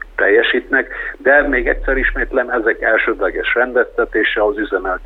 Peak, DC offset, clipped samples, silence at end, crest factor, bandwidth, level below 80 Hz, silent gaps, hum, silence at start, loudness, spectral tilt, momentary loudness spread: 0 dBFS; under 0.1%; under 0.1%; 0 s; 16 dB; 4.4 kHz; -30 dBFS; none; none; 0.05 s; -15 LUFS; -6.5 dB/octave; 6 LU